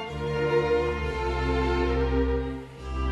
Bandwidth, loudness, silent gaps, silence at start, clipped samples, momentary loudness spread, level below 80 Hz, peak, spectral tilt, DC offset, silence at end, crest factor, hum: 8.6 kHz; -27 LUFS; none; 0 s; under 0.1%; 9 LU; -32 dBFS; -12 dBFS; -7 dB/octave; under 0.1%; 0 s; 14 dB; none